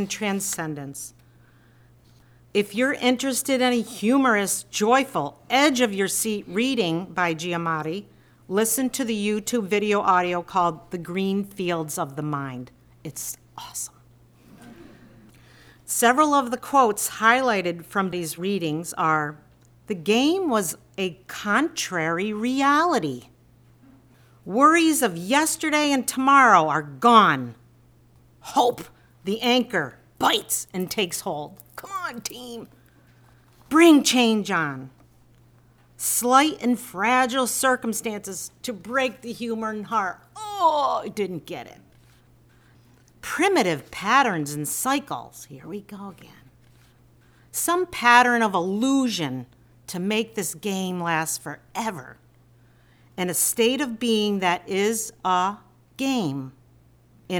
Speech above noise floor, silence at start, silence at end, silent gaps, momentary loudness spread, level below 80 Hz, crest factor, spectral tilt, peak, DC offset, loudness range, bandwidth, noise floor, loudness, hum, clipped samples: 33 dB; 0 s; 0 s; none; 16 LU; -62 dBFS; 22 dB; -3.5 dB/octave; -2 dBFS; under 0.1%; 8 LU; over 20 kHz; -56 dBFS; -22 LUFS; none; under 0.1%